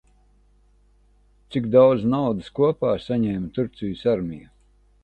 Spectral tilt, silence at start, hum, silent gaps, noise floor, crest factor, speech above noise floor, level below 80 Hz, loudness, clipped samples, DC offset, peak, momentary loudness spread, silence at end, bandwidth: -9 dB/octave; 1.5 s; 50 Hz at -50 dBFS; none; -58 dBFS; 18 dB; 37 dB; -52 dBFS; -22 LUFS; under 0.1%; under 0.1%; -4 dBFS; 12 LU; 0.65 s; 8.2 kHz